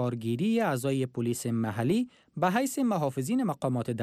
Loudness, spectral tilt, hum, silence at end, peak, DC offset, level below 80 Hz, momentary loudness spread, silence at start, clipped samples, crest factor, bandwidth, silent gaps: -29 LUFS; -6 dB/octave; none; 0 s; -16 dBFS; under 0.1%; -70 dBFS; 4 LU; 0 s; under 0.1%; 12 dB; 15.5 kHz; none